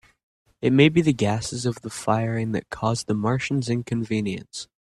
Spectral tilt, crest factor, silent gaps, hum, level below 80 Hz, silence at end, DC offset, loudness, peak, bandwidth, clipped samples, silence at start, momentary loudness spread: -6 dB/octave; 20 dB; none; none; -54 dBFS; 0.25 s; under 0.1%; -23 LUFS; -4 dBFS; 12.5 kHz; under 0.1%; 0.6 s; 11 LU